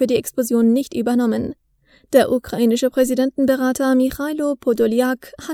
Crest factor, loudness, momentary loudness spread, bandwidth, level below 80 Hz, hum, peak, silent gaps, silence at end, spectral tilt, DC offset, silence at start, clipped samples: 18 dB; -18 LUFS; 6 LU; 18.5 kHz; -50 dBFS; none; 0 dBFS; none; 0 s; -5 dB/octave; under 0.1%; 0 s; under 0.1%